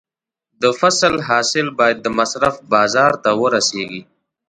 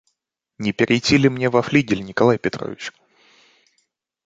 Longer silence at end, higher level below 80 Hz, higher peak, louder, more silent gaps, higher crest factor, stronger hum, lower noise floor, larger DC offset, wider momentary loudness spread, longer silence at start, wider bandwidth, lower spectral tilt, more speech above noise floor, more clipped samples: second, 0.45 s vs 1.35 s; about the same, -54 dBFS vs -52 dBFS; about the same, 0 dBFS vs -2 dBFS; first, -16 LUFS vs -19 LUFS; neither; about the same, 16 dB vs 20 dB; neither; first, -81 dBFS vs -77 dBFS; neither; second, 5 LU vs 14 LU; about the same, 0.6 s vs 0.6 s; first, 11 kHz vs 9.2 kHz; second, -3 dB/octave vs -5.5 dB/octave; first, 65 dB vs 58 dB; neither